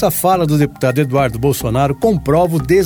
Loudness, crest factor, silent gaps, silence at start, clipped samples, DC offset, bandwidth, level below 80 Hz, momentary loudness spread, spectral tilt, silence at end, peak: -15 LUFS; 12 dB; none; 0 s; under 0.1%; under 0.1%; over 20 kHz; -34 dBFS; 3 LU; -6.5 dB/octave; 0 s; 0 dBFS